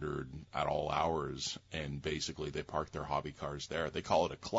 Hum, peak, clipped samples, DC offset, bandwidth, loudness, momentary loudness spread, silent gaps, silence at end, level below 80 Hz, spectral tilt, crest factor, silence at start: none; -16 dBFS; under 0.1%; under 0.1%; 7.6 kHz; -37 LUFS; 8 LU; none; 0 s; -56 dBFS; -3.5 dB/octave; 20 dB; 0 s